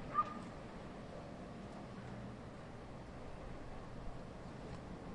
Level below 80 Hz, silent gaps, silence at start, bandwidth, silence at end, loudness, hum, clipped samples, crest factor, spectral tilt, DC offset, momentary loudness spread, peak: -58 dBFS; none; 0 s; 11 kHz; 0 s; -49 LUFS; none; under 0.1%; 22 dB; -6.5 dB/octave; under 0.1%; 6 LU; -24 dBFS